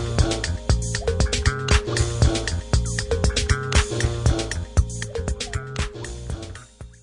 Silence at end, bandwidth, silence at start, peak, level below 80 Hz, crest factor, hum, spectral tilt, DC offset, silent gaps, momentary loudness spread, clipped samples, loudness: 0.1 s; 11 kHz; 0 s; -4 dBFS; -28 dBFS; 18 dB; none; -4.5 dB/octave; under 0.1%; none; 12 LU; under 0.1%; -23 LUFS